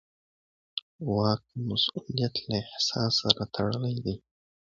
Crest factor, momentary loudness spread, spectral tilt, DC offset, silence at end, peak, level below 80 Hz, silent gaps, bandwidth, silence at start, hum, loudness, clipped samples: 28 dB; 12 LU; -5 dB/octave; under 0.1%; 0.5 s; -2 dBFS; -56 dBFS; 0.82-0.99 s; 7.8 kHz; 0.75 s; none; -29 LUFS; under 0.1%